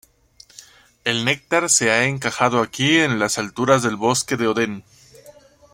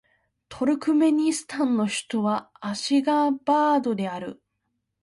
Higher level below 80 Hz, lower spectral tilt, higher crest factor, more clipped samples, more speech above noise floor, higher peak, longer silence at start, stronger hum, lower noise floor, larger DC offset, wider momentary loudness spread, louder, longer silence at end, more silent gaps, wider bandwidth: first, -58 dBFS vs -68 dBFS; second, -3 dB/octave vs -4.5 dB/octave; first, 20 dB vs 14 dB; neither; second, 32 dB vs 54 dB; first, -2 dBFS vs -10 dBFS; first, 1.05 s vs 0.5 s; neither; second, -51 dBFS vs -77 dBFS; neither; about the same, 7 LU vs 9 LU; first, -19 LUFS vs -24 LUFS; second, 0.45 s vs 0.7 s; neither; first, 16.5 kHz vs 11.5 kHz